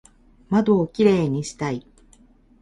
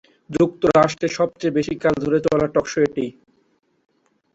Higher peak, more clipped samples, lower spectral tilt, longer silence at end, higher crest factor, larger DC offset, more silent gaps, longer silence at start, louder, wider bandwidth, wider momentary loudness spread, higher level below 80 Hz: about the same, -4 dBFS vs -2 dBFS; neither; about the same, -7 dB/octave vs -6 dB/octave; second, 0.8 s vs 1.25 s; about the same, 18 dB vs 18 dB; neither; neither; first, 0.5 s vs 0.3 s; about the same, -21 LUFS vs -20 LUFS; first, 11.5 kHz vs 8 kHz; first, 10 LU vs 6 LU; about the same, -52 dBFS vs -50 dBFS